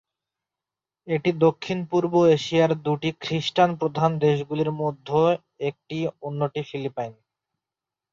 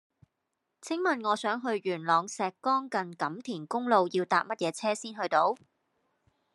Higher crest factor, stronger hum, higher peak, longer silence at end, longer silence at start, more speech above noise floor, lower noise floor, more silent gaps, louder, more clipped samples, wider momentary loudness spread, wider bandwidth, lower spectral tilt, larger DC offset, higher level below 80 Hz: about the same, 18 dB vs 20 dB; neither; first, -6 dBFS vs -10 dBFS; about the same, 1 s vs 1 s; first, 1.05 s vs 0.85 s; first, 66 dB vs 53 dB; first, -89 dBFS vs -83 dBFS; neither; first, -24 LUFS vs -30 LUFS; neither; first, 11 LU vs 8 LU; second, 7.6 kHz vs 12 kHz; first, -7 dB/octave vs -4 dB/octave; neither; first, -64 dBFS vs -86 dBFS